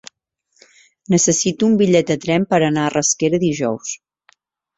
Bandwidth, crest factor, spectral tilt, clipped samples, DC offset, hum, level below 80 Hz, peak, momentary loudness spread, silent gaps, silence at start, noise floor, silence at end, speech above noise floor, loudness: 8.4 kHz; 16 dB; -4.5 dB/octave; under 0.1%; under 0.1%; none; -56 dBFS; -2 dBFS; 8 LU; none; 1.1 s; -66 dBFS; 0.8 s; 49 dB; -17 LUFS